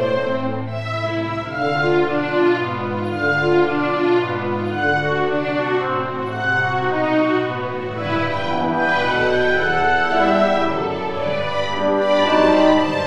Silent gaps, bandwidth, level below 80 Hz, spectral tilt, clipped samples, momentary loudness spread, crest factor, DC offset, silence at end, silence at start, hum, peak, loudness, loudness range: none; 9.2 kHz; -50 dBFS; -6.5 dB/octave; under 0.1%; 7 LU; 18 dB; under 0.1%; 0 s; 0 s; none; -2 dBFS; -19 LUFS; 2 LU